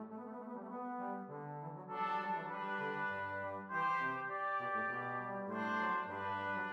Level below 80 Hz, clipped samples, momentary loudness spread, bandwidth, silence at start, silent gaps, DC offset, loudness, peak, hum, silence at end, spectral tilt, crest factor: -88 dBFS; under 0.1%; 10 LU; 10 kHz; 0 s; none; under 0.1%; -40 LUFS; -26 dBFS; none; 0 s; -6.5 dB/octave; 16 dB